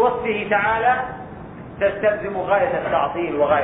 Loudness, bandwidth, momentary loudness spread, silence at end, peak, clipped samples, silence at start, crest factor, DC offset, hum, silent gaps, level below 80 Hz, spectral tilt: -20 LUFS; 3.9 kHz; 15 LU; 0 s; -6 dBFS; under 0.1%; 0 s; 14 dB; under 0.1%; none; none; -48 dBFS; -9.5 dB/octave